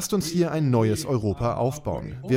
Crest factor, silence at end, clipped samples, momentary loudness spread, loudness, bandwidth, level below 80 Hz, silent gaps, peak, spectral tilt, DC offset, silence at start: 16 dB; 0 s; under 0.1%; 9 LU; -25 LUFS; 16.5 kHz; -46 dBFS; none; -8 dBFS; -6 dB/octave; under 0.1%; 0 s